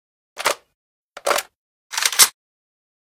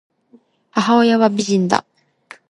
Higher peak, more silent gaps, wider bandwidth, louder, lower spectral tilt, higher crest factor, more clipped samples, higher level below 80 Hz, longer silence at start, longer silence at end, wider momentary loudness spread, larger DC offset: about the same, 0 dBFS vs 0 dBFS; first, 0.75-1.12 s, 1.56-1.90 s vs none; first, 17 kHz vs 11 kHz; about the same, -18 LUFS vs -16 LUFS; second, 2 dB/octave vs -5 dB/octave; first, 24 dB vs 18 dB; neither; about the same, -68 dBFS vs -64 dBFS; second, 0.35 s vs 0.75 s; about the same, 0.75 s vs 0.7 s; first, 15 LU vs 7 LU; neither